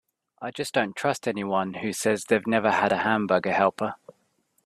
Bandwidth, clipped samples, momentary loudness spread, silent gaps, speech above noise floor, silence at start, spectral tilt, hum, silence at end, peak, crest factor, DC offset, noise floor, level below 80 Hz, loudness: 14 kHz; under 0.1%; 10 LU; none; 45 dB; 0.4 s; -4.5 dB/octave; none; 0.7 s; -6 dBFS; 20 dB; under 0.1%; -70 dBFS; -68 dBFS; -25 LUFS